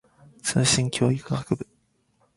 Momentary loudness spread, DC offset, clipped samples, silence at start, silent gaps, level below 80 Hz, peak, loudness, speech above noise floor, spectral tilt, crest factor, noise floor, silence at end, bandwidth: 10 LU; under 0.1%; under 0.1%; 0.45 s; none; -54 dBFS; -6 dBFS; -24 LUFS; 44 dB; -4 dB/octave; 20 dB; -67 dBFS; 0.75 s; 11.5 kHz